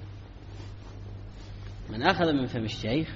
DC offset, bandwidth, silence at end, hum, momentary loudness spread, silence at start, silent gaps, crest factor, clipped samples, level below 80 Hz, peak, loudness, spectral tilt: under 0.1%; 7.6 kHz; 0 s; none; 19 LU; 0 s; none; 24 dB; under 0.1%; -46 dBFS; -6 dBFS; -28 LUFS; -4.5 dB/octave